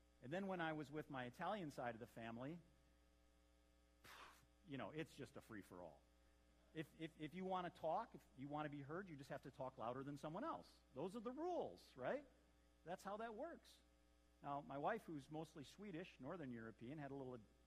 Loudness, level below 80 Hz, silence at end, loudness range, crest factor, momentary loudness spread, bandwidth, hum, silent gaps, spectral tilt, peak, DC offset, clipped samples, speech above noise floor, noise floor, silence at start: -52 LUFS; -78 dBFS; 0 s; 7 LU; 20 dB; 12 LU; 15 kHz; none; none; -6.5 dB/octave; -32 dBFS; under 0.1%; under 0.1%; 24 dB; -76 dBFS; 0 s